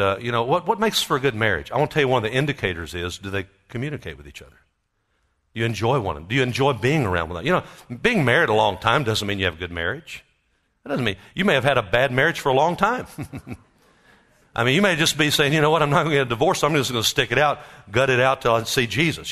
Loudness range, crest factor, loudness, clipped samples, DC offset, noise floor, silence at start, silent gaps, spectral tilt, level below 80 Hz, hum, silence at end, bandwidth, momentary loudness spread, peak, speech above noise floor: 7 LU; 20 dB; -21 LUFS; under 0.1%; under 0.1%; -71 dBFS; 0 s; none; -4.5 dB/octave; -48 dBFS; none; 0 s; 13.5 kHz; 13 LU; -2 dBFS; 49 dB